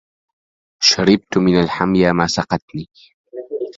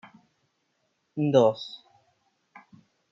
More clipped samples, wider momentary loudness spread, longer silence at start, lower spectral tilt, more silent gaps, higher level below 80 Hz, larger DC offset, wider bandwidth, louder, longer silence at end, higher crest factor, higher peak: neither; about the same, 18 LU vs 20 LU; second, 0.8 s vs 1.15 s; second, -4.5 dB/octave vs -7.5 dB/octave; first, 2.62-2.68 s, 3.14-3.24 s vs none; first, -46 dBFS vs -80 dBFS; neither; about the same, 7.8 kHz vs 7.2 kHz; first, -16 LUFS vs -24 LUFS; second, 0.05 s vs 1.35 s; about the same, 18 dB vs 22 dB; first, 0 dBFS vs -8 dBFS